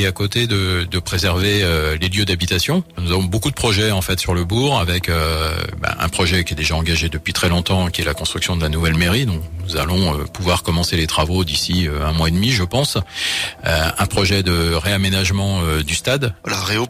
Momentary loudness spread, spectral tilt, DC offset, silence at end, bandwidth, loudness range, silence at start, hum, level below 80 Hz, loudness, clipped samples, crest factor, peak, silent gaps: 4 LU; -4.5 dB/octave; under 0.1%; 0 s; 16 kHz; 1 LU; 0 s; none; -30 dBFS; -18 LUFS; under 0.1%; 14 dB; -4 dBFS; none